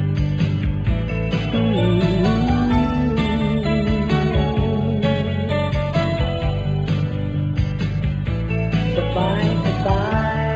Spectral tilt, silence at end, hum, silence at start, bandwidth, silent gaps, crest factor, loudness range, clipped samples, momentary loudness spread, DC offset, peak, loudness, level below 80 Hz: -8 dB/octave; 0 s; none; 0 s; 8 kHz; none; 12 dB; 3 LU; under 0.1%; 5 LU; under 0.1%; -6 dBFS; -20 LUFS; -28 dBFS